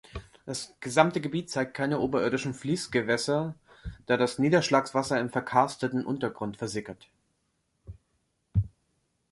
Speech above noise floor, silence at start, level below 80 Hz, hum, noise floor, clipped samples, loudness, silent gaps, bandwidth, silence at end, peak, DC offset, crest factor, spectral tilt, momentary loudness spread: 48 dB; 0.15 s; -50 dBFS; none; -75 dBFS; under 0.1%; -28 LUFS; none; 11.5 kHz; 0.65 s; -6 dBFS; under 0.1%; 24 dB; -5.5 dB/octave; 13 LU